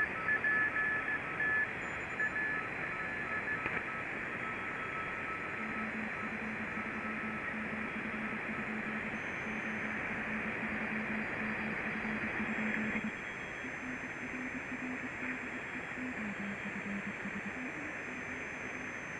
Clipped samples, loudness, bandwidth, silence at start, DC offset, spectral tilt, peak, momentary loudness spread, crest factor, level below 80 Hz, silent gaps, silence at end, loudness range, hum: under 0.1%; -37 LUFS; 11.5 kHz; 0 s; under 0.1%; -5.5 dB/octave; -20 dBFS; 8 LU; 18 dB; -62 dBFS; none; 0 s; 5 LU; none